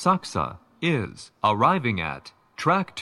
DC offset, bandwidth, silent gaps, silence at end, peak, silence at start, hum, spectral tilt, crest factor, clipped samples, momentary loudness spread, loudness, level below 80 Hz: under 0.1%; 12 kHz; none; 0 s; -6 dBFS; 0 s; none; -5.5 dB/octave; 20 dB; under 0.1%; 13 LU; -24 LUFS; -54 dBFS